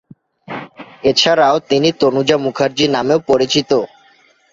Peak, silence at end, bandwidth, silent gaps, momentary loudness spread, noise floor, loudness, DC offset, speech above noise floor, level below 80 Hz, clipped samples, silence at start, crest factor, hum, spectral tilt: -2 dBFS; 0.65 s; 7.8 kHz; none; 18 LU; -51 dBFS; -14 LUFS; under 0.1%; 38 dB; -54 dBFS; under 0.1%; 0.5 s; 14 dB; none; -4 dB/octave